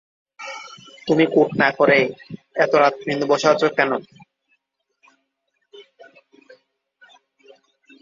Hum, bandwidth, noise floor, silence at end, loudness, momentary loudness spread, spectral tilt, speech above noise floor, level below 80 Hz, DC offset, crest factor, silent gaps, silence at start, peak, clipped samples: none; 7.6 kHz; -73 dBFS; 2.2 s; -18 LUFS; 19 LU; -5 dB/octave; 55 dB; -66 dBFS; under 0.1%; 20 dB; none; 0.4 s; -2 dBFS; under 0.1%